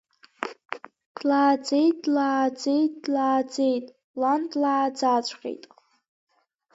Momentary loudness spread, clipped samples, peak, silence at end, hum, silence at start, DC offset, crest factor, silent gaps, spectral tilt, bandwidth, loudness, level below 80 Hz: 16 LU; under 0.1%; -8 dBFS; 1.2 s; none; 0.4 s; under 0.1%; 18 dB; 1.06-1.15 s, 4.04-4.14 s; -3.5 dB/octave; 8 kHz; -24 LUFS; -80 dBFS